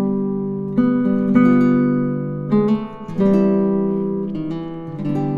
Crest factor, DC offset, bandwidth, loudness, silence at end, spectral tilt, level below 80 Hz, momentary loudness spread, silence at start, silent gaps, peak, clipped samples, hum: 16 dB; under 0.1%; 4.9 kHz; -18 LUFS; 0 s; -10.5 dB/octave; -48 dBFS; 11 LU; 0 s; none; -2 dBFS; under 0.1%; none